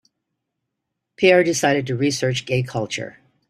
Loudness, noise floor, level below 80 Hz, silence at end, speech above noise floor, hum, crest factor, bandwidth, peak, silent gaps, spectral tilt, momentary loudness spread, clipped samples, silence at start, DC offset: -19 LUFS; -79 dBFS; -60 dBFS; 0.4 s; 60 dB; none; 20 dB; 15 kHz; -2 dBFS; none; -4.5 dB/octave; 12 LU; under 0.1%; 1.2 s; under 0.1%